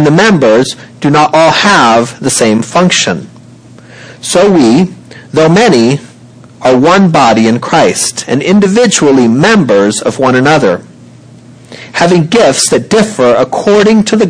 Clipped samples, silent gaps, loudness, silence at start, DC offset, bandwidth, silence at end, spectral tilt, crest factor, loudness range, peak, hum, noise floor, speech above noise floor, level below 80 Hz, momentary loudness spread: under 0.1%; none; -7 LUFS; 0 s; under 0.1%; 10.5 kHz; 0 s; -4.5 dB/octave; 8 dB; 3 LU; 0 dBFS; none; -34 dBFS; 28 dB; -44 dBFS; 7 LU